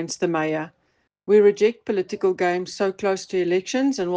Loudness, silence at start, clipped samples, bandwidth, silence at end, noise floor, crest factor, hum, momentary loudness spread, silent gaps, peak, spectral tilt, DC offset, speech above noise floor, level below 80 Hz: -22 LUFS; 0 s; under 0.1%; 9.4 kHz; 0 s; -69 dBFS; 16 dB; none; 9 LU; none; -6 dBFS; -5 dB/octave; under 0.1%; 47 dB; -68 dBFS